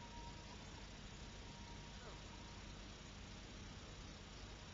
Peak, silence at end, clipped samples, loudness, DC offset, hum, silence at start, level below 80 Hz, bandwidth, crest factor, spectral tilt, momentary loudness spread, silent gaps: -40 dBFS; 0 s; under 0.1%; -55 LUFS; under 0.1%; 50 Hz at -60 dBFS; 0 s; -60 dBFS; 7.4 kHz; 14 dB; -3.5 dB/octave; 1 LU; none